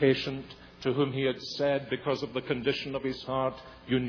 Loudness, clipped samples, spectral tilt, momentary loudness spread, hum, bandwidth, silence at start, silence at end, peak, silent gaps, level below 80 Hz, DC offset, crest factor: -31 LUFS; under 0.1%; -6.5 dB/octave; 7 LU; none; 5.4 kHz; 0 s; 0 s; -12 dBFS; none; -58 dBFS; under 0.1%; 18 dB